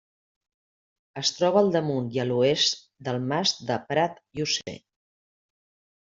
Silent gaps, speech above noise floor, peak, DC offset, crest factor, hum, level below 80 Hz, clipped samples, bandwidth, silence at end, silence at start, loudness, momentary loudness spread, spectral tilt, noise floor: none; over 65 dB; -6 dBFS; under 0.1%; 20 dB; none; -68 dBFS; under 0.1%; 7.8 kHz; 1.3 s; 1.15 s; -25 LUFS; 11 LU; -4 dB/octave; under -90 dBFS